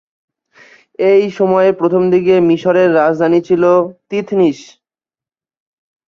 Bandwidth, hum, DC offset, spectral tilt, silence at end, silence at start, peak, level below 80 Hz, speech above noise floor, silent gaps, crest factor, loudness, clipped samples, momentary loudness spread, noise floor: 7 kHz; none; under 0.1%; -7.5 dB/octave; 1.55 s; 1 s; -2 dBFS; -58 dBFS; over 78 dB; none; 12 dB; -12 LUFS; under 0.1%; 6 LU; under -90 dBFS